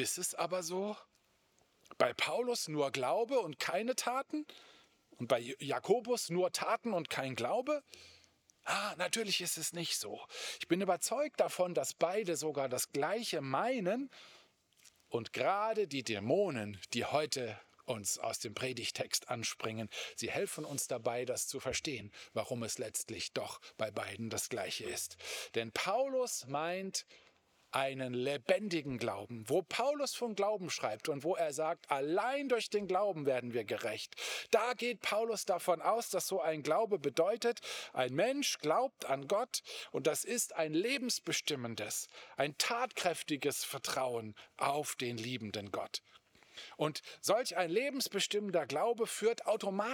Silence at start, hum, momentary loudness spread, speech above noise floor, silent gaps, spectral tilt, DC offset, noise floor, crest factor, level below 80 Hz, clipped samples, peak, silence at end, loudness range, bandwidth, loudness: 0 s; none; 8 LU; 37 dB; none; -3 dB/octave; under 0.1%; -73 dBFS; 22 dB; -80 dBFS; under 0.1%; -14 dBFS; 0 s; 4 LU; over 20 kHz; -36 LUFS